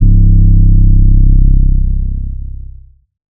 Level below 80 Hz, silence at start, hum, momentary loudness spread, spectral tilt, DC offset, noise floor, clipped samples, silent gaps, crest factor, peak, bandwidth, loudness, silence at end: -8 dBFS; 0 s; none; 16 LU; -23.5 dB/octave; under 0.1%; -34 dBFS; under 0.1%; none; 6 dB; 0 dBFS; 0.6 kHz; -11 LUFS; 0.1 s